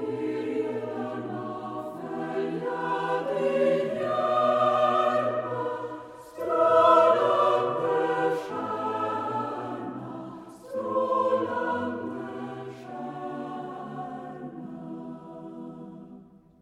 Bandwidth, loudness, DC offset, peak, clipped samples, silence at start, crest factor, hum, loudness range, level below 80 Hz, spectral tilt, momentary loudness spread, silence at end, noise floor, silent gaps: 13 kHz; -27 LUFS; under 0.1%; -6 dBFS; under 0.1%; 0 s; 22 dB; none; 14 LU; -72 dBFS; -6.5 dB/octave; 17 LU; 0.4 s; -50 dBFS; none